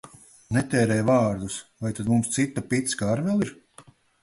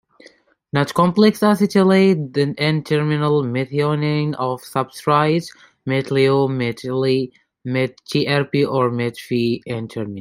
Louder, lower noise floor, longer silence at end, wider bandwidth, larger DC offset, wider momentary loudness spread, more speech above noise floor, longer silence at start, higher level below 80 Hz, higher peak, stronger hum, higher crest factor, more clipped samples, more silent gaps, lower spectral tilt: second, -25 LUFS vs -19 LUFS; about the same, -53 dBFS vs -51 dBFS; first, 0.4 s vs 0 s; second, 11.5 kHz vs 16 kHz; neither; about the same, 10 LU vs 10 LU; second, 29 dB vs 33 dB; second, 0.05 s vs 0.75 s; about the same, -54 dBFS vs -58 dBFS; second, -8 dBFS vs -2 dBFS; neither; about the same, 16 dB vs 16 dB; neither; neither; second, -5.5 dB/octave vs -7 dB/octave